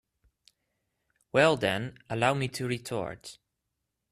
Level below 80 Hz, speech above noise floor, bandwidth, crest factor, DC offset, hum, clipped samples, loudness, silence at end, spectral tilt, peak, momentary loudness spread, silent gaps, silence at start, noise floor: -64 dBFS; 55 dB; 14 kHz; 24 dB; under 0.1%; none; under 0.1%; -29 LUFS; 0.8 s; -5 dB/octave; -8 dBFS; 14 LU; none; 1.35 s; -83 dBFS